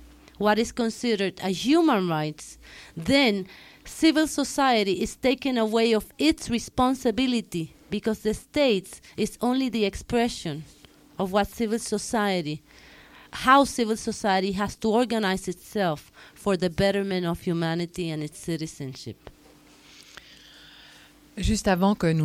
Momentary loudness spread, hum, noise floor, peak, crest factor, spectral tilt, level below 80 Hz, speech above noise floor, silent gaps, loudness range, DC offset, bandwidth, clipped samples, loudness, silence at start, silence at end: 15 LU; none; -54 dBFS; -6 dBFS; 20 dB; -5 dB/octave; -46 dBFS; 29 dB; none; 7 LU; under 0.1%; 16.5 kHz; under 0.1%; -25 LUFS; 0 s; 0 s